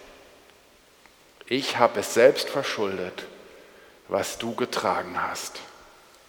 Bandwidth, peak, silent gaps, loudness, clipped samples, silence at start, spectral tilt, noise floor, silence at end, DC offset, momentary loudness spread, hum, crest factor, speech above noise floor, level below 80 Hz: 19 kHz; -4 dBFS; none; -25 LUFS; under 0.1%; 0 s; -3 dB/octave; -56 dBFS; 0.55 s; under 0.1%; 18 LU; none; 24 dB; 31 dB; -66 dBFS